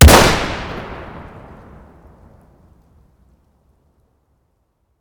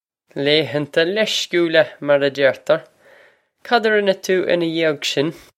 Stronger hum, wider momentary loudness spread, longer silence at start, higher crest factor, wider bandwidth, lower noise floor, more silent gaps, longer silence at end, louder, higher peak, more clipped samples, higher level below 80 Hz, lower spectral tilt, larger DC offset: neither; first, 30 LU vs 5 LU; second, 0 s vs 0.35 s; about the same, 18 dB vs 18 dB; first, over 20 kHz vs 16 kHz; first, -65 dBFS vs -53 dBFS; neither; first, 3.8 s vs 0.2 s; first, -14 LUFS vs -18 LUFS; about the same, 0 dBFS vs 0 dBFS; first, 0.8% vs under 0.1%; first, -22 dBFS vs -66 dBFS; about the same, -4 dB/octave vs -4 dB/octave; neither